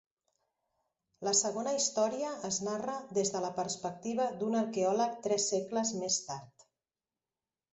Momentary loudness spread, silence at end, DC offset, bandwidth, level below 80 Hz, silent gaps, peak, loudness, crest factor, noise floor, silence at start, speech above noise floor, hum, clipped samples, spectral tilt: 8 LU; 1.3 s; under 0.1%; 8.2 kHz; -78 dBFS; none; -14 dBFS; -33 LUFS; 20 dB; under -90 dBFS; 1.2 s; over 57 dB; none; under 0.1%; -3 dB/octave